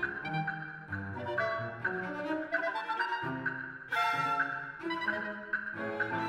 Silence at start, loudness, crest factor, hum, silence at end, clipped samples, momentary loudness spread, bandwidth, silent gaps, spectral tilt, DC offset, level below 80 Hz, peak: 0 s; -34 LUFS; 16 dB; none; 0 s; under 0.1%; 8 LU; 16 kHz; none; -5.5 dB/octave; under 0.1%; -70 dBFS; -18 dBFS